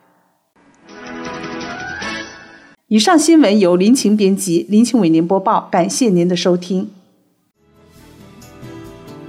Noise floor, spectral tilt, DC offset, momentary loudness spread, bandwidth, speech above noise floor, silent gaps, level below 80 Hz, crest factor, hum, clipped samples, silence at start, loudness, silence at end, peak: -59 dBFS; -5 dB/octave; under 0.1%; 22 LU; 16 kHz; 47 dB; none; -56 dBFS; 14 dB; none; under 0.1%; 0.9 s; -14 LUFS; 0 s; -2 dBFS